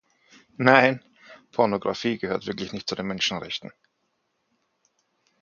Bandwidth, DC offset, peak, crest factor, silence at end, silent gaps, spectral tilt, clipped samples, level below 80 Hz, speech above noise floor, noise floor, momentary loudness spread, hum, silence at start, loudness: 7.2 kHz; under 0.1%; 0 dBFS; 26 dB; 1.75 s; none; -4.5 dB/octave; under 0.1%; -62 dBFS; 50 dB; -74 dBFS; 16 LU; none; 0.6 s; -24 LUFS